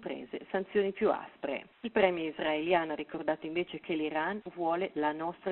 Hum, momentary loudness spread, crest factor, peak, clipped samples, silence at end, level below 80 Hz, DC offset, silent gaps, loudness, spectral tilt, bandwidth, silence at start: none; 9 LU; 22 dB; -10 dBFS; under 0.1%; 0 s; -70 dBFS; under 0.1%; none; -33 LUFS; -3 dB/octave; 4.2 kHz; 0 s